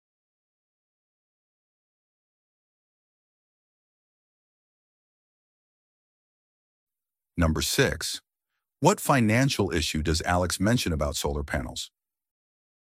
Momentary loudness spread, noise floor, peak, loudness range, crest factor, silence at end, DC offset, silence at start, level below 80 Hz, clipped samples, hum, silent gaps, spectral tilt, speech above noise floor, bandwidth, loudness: 12 LU; -85 dBFS; -6 dBFS; 6 LU; 24 dB; 1 s; under 0.1%; 7.35 s; -42 dBFS; under 0.1%; none; none; -4.5 dB/octave; 60 dB; 16 kHz; -25 LUFS